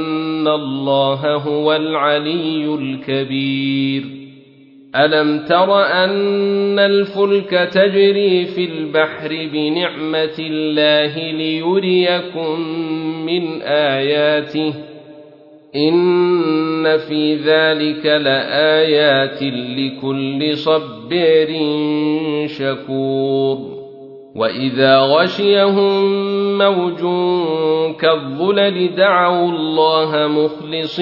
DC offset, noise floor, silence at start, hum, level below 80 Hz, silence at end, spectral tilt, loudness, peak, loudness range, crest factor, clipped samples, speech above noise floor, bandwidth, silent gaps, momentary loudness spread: under 0.1%; -44 dBFS; 0 s; none; -64 dBFS; 0 s; -7.5 dB/octave; -16 LUFS; 0 dBFS; 4 LU; 14 dB; under 0.1%; 28 dB; 6 kHz; none; 8 LU